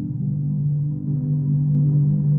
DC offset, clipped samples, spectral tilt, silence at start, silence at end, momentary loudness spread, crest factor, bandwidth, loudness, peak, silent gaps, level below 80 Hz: under 0.1%; under 0.1%; -15.5 dB/octave; 0 s; 0 s; 6 LU; 10 dB; 1 kHz; -21 LUFS; -10 dBFS; none; -48 dBFS